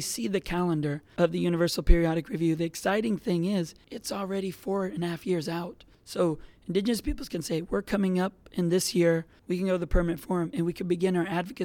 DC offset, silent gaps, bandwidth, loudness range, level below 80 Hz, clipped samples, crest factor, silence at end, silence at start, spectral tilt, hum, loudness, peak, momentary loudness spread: under 0.1%; none; 17.5 kHz; 4 LU; -36 dBFS; under 0.1%; 22 dB; 0 s; 0 s; -5.5 dB/octave; none; -29 LUFS; -6 dBFS; 8 LU